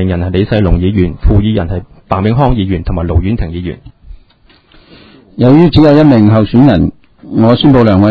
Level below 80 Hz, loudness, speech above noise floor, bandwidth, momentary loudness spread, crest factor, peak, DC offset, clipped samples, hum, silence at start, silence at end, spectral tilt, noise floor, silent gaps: -20 dBFS; -9 LUFS; 38 dB; 5.6 kHz; 13 LU; 10 dB; 0 dBFS; under 0.1%; 2%; none; 0 s; 0 s; -10 dB/octave; -46 dBFS; none